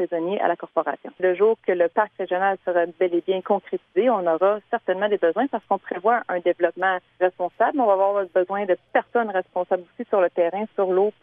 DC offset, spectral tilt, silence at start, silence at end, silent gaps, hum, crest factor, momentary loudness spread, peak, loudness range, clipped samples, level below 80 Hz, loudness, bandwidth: under 0.1%; -8.5 dB/octave; 0 s; 0.15 s; none; none; 18 dB; 5 LU; -6 dBFS; 1 LU; under 0.1%; -76 dBFS; -23 LUFS; 3.7 kHz